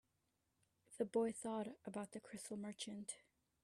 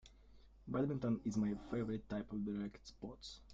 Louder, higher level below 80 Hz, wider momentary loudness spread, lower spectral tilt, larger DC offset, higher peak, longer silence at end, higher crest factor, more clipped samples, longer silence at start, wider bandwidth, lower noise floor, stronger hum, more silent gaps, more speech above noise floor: second, -46 LUFS vs -42 LUFS; second, -86 dBFS vs -62 dBFS; second, 11 LU vs 14 LU; second, -4.5 dB/octave vs -7.5 dB/octave; neither; about the same, -28 dBFS vs -26 dBFS; first, 0.45 s vs 0 s; about the same, 20 dB vs 16 dB; neither; first, 0.9 s vs 0.05 s; first, 13.5 kHz vs 7.8 kHz; first, -86 dBFS vs -63 dBFS; neither; neither; first, 40 dB vs 21 dB